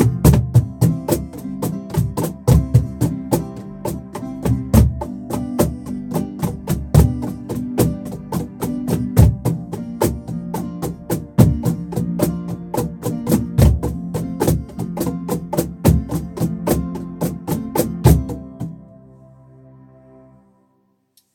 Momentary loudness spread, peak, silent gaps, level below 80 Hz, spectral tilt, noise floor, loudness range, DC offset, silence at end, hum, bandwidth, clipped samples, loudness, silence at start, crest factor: 13 LU; 0 dBFS; none; -28 dBFS; -7 dB/octave; -63 dBFS; 3 LU; under 0.1%; 2.4 s; none; 18.5 kHz; under 0.1%; -20 LUFS; 0 s; 18 dB